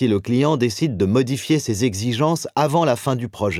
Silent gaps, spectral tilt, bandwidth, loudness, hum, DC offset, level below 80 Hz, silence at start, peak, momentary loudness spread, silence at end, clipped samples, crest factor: none; -6 dB/octave; 16 kHz; -20 LUFS; none; under 0.1%; -54 dBFS; 0 s; -4 dBFS; 3 LU; 0 s; under 0.1%; 16 dB